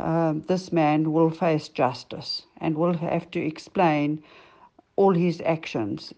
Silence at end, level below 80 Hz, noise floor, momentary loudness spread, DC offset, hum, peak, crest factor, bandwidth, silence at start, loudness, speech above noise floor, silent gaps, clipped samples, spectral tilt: 0.05 s; -64 dBFS; -55 dBFS; 9 LU; under 0.1%; none; -8 dBFS; 16 dB; 8.4 kHz; 0 s; -25 LUFS; 31 dB; none; under 0.1%; -7.5 dB/octave